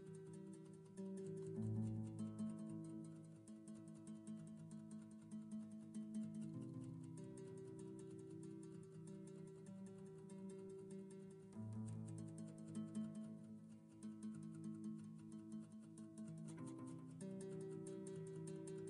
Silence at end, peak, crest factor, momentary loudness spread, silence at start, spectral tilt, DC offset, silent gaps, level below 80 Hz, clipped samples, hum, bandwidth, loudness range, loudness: 0 s; -34 dBFS; 18 dB; 8 LU; 0 s; -7.5 dB/octave; under 0.1%; none; -84 dBFS; under 0.1%; none; 11.5 kHz; 6 LU; -54 LUFS